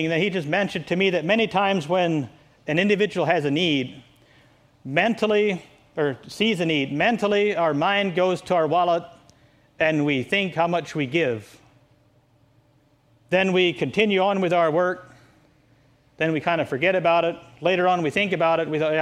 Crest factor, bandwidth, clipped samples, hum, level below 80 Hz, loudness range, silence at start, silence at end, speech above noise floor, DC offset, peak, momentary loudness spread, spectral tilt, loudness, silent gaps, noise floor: 20 dB; 13.5 kHz; under 0.1%; none; -62 dBFS; 3 LU; 0 s; 0 s; 39 dB; under 0.1%; -4 dBFS; 7 LU; -6 dB/octave; -22 LUFS; none; -60 dBFS